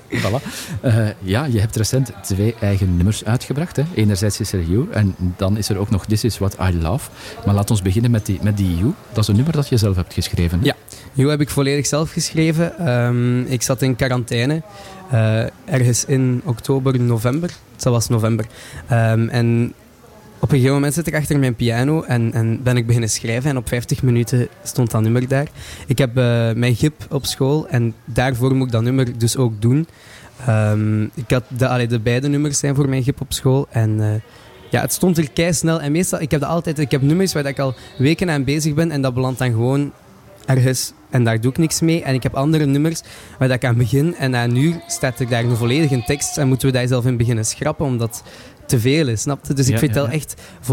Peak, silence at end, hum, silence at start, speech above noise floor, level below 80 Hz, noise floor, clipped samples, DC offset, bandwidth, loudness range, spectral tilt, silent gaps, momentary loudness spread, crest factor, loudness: -6 dBFS; 0 s; none; 0.1 s; 26 dB; -42 dBFS; -44 dBFS; under 0.1%; under 0.1%; 17 kHz; 1 LU; -5.5 dB/octave; none; 5 LU; 12 dB; -18 LUFS